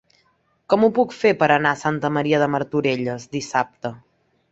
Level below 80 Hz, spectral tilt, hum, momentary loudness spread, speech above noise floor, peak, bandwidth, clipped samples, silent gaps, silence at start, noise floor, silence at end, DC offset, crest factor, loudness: -60 dBFS; -6 dB/octave; none; 11 LU; 44 dB; -2 dBFS; 8 kHz; under 0.1%; none; 0.7 s; -64 dBFS; 0.55 s; under 0.1%; 20 dB; -20 LUFS